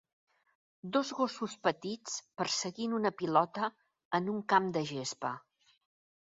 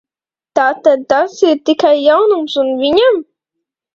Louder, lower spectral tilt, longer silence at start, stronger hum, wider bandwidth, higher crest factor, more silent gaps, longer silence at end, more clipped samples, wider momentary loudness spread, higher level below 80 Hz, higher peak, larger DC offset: second, -34 LUFS vs -12 LUFS; about the same, -3.5 dB/octave vs -3.5 dB/octave; first, 0.85 s vs 0.55 s; neither; about the same, 7.6 kHz vs 7.6 kHz; first, 22 dB vs 14 dB; first, 4.05-4.11 s vs none; first, 0.9 s vs 0.75 s; neither; first, 10 LU vs 5 LU; second, -78 dBFS vs -56 dBFS; second, -12 dBFS vs 0 dBFS; neither